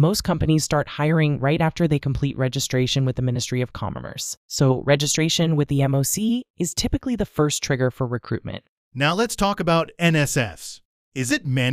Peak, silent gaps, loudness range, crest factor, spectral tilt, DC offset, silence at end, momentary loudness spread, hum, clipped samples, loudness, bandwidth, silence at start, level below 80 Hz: -4 dBFS; 4.37-4.49 s, 6.50-6.54 s, 8.69-8.91 s, 10.85-11.12 s; 2 LU; 18 dB; -5 dB/octave; under 0.1%; 0 s; 10 LU; none; under 0.1%; -22 LUFS; 15.5 kHz; 0 s; -42 dBFS